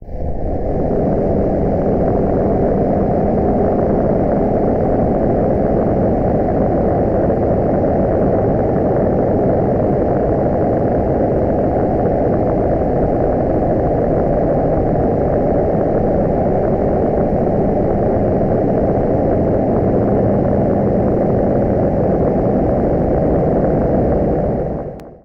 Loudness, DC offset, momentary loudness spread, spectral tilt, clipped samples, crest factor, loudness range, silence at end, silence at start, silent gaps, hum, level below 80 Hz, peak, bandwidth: -16 LUFS; under 0.1%; 1 LU; -12 dB/octave; under 0.1%; 10 dB; 1 LU; 0.05 s; 0 s; none; none; -26 dBFS; -6 dBFS; 5.8 kHz